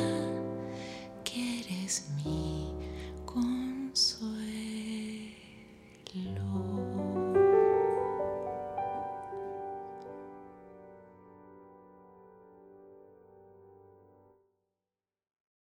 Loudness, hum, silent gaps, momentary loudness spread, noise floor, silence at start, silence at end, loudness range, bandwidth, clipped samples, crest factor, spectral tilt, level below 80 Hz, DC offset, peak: -33 LUFS; none; none; 24 LU; under -90 dBFS; 0 s; 1.8 s; 16 LU; 14 kHz; under 0.1%; 22 dB; -4.5 dB/octave; -56 dBFS; under 0.1%; -12 dBFS